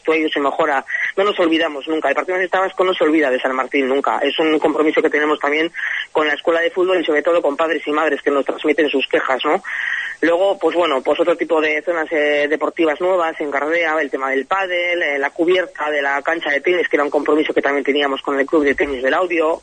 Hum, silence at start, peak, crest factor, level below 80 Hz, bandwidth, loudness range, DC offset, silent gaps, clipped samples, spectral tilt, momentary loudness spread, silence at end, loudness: none; 0.05 s; -2 dBFS; 14 dB; -58 dBFS; 9.4 kHz; 1 LU; under 0.1%; none; under 0.1%; -4 dB/octave; 3 LU; 0.05 s; -17 LUFS